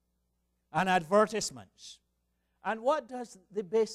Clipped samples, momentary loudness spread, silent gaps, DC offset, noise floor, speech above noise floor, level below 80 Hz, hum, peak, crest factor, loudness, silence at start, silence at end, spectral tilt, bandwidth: under 0.1%; 23 LU; none; under 0.1%; -78 dBFS; 48 dB; -68 dBFS; 60 Hz at -70 dBFS; -14 dBFS; 20 dB; -31 LUFS; 0.75 s; 0 s; -4 dB/octave; 14 kHz